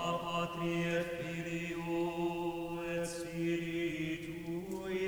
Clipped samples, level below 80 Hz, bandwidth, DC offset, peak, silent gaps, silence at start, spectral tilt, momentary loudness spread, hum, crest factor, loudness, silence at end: under 0.1%; -62 dBFS; over 20 kHz; under 0.1%; -22 dBFS; none; 0 s; -5.5 dB/octave; 5 LU; none; 14 dB; -37 LUFS; 0 s